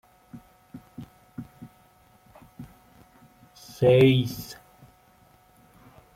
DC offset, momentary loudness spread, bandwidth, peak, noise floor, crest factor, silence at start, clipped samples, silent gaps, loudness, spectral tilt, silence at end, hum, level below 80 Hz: under 0.1%; 30 LU; 16 kHz; -8 dBFS; -58 dBFS; 22 dB; 0.35 s; under 0.1%; none; -21 LUFS; -7 dB/octave; 1.65 s; none; -60 dBFS